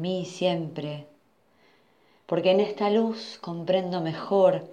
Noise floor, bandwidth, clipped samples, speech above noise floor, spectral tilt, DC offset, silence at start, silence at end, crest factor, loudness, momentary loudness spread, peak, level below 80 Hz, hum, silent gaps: -64 dBFS; 9 kHz; under 0.1%; 39 dB; -6.5 dB/octave; under 0.1%; 0 s; 0 s; 18 dB; -26 LUFS; 14 LU; -8 dBFS; -78 dBFS; none; none